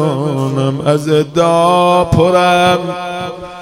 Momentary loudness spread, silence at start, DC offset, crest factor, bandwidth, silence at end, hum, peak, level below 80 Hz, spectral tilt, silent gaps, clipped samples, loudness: 11 LU; 0 s; under 0.1%; 12 dB; 16.5 kHz; 0 s; none; 0 dBFS; -40 dBFS; -6 dB/octave; none; under 0.1%; -12 LUFS